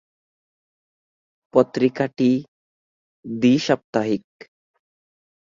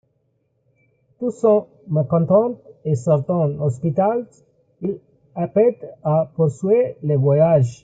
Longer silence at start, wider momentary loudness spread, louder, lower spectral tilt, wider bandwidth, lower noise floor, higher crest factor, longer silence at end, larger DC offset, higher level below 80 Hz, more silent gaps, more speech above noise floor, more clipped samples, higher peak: first, 1.55 s vs 1.2 s; second, 7 LU vs 12 LU; about the same, -21 LUFS vs -19 LUFS; second, -6.5 dB/octave vs -10 dB/octave; second, 7.4 kHz vs 9 kHz; first, under -90 dBFS vs -67 dBFS; about the same, 20 dB vs 16 dB; first, 1.25 s vs 0.1 s; neither; about the same, -64 dBFS vs -60 dBFS; first, 2.48-3.23 s, 3.84-3.93 s vs none; first, over 71 dB vs 49 dB; neither; about the same, -2 dBFS vs -4 dBFS